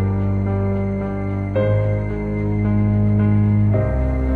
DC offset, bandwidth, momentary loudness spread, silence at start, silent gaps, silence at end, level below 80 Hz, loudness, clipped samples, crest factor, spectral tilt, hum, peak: under 0.1%; 3.4 kHz; 6 LU; 0 s; none; 0 s; -28 dBFS; -19 LUFS; under 0.1%; 10 dB; -11 dB/octave; none; -8 dBFS